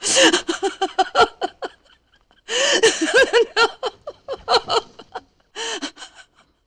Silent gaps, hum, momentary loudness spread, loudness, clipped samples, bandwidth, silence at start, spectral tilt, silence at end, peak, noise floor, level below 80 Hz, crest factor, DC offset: none; none; 22 LU; -18 LUFS; under 0.1%; 12.5 kHz; 0 s; -0.5 dB/octave; 0.6 s; -4 dBFS; -59 dBFS; -56 dBFS; 18 dB; under 0.1%